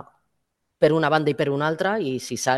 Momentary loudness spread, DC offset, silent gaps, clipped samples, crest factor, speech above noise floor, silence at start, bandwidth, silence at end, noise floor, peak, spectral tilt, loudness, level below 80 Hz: 6 LU; under 0.1%; none; under 0.1%; 18 dB; 55 dB; 0.8 s; 12.5 kHz; 0 s; -76 dBFS; -4 dBFS; -5 dB/octave; -22 LUFS; -64 dBFS